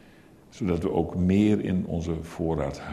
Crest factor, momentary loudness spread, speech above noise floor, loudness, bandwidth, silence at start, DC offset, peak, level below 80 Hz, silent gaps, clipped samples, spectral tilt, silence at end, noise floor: 16 dB; 8 LU; 27 dB; -26 LUFS; 12 kHz; 0.5 s; under 0.1%; -10 dBFS; -44 dBFS; none; under 0.1%; -8 dB/octave; 0 s; -53 dBFS